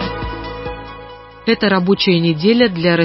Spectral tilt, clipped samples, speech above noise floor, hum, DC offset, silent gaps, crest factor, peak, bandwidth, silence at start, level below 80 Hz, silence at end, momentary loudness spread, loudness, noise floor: -10 dB/octave; under 0.1%; 22 dB; none; under 0.1%; none; 14 dB; -2 dBFS; 5.8 kHz; 0 s; -38 dBFS; 0 s; 18 LU; -15 LUFS; -36 dBFS